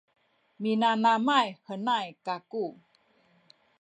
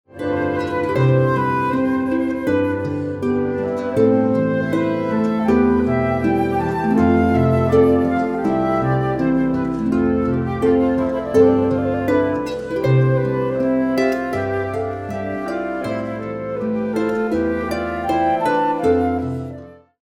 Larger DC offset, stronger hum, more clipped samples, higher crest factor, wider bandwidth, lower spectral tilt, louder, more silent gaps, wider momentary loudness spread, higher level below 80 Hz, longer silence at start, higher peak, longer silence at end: neither; neither; neither; about the same, 18 dB vs 16 dB; second, 8.8 kHz vs 12.5 kHz; second, -5 dB/octave vs -8.5 dB/octave; second, -28 LUFS vs -19 LUFS; neither; first, 12 LU vs 8 LU; second, -86 dBFS vs -42 dBFS; first, 0.6 s vs 0.15 s; second, -12 dBFS vs -2 dBFS; first, 1.1 s vs 0.3 s